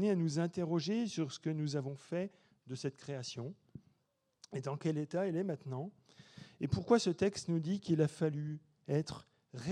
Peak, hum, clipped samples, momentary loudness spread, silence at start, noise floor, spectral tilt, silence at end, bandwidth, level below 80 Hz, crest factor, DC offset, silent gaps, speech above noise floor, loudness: -16 dBFS; none; under 0.1%; 15 LU; 0 s; -80 dBFS; -6.5 dB/octave; 0 s; 10.5 kHz; -68 dBFS; 22 dB; under 0.1%; none; 44 dB; -37 LUFS